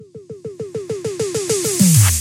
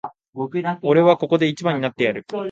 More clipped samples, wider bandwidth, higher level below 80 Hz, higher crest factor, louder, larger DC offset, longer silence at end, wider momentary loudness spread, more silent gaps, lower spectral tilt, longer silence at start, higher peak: neither; first, 17 kHz vs 7.8 kHz; first, -44 dBFS vs -66 dBFS; about the same, 16 dB vs 18 dB; first, -16 LUFS vs -19 LUFS; neither; about the same, 0 s vs 0 s; first, 22 LU vs 12 LU; second, none vs 0.29-0.33 s; second, -4.5 dB/octave vs -7 dB/octave; about the same, 0 s vs 0.05 s; about the same, 0 dBFS vs -2 dBFS